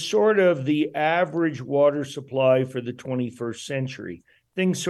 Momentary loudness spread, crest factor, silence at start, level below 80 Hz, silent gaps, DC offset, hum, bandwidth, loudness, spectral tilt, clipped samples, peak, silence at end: 12 LU; 16 dB; 0 s; -70 dBFS; none; under 0.1%; none; 12.5 kHz; -23 LUFS; -5.5 dB/octave; under 0.1%; -8 dBFS; 0 s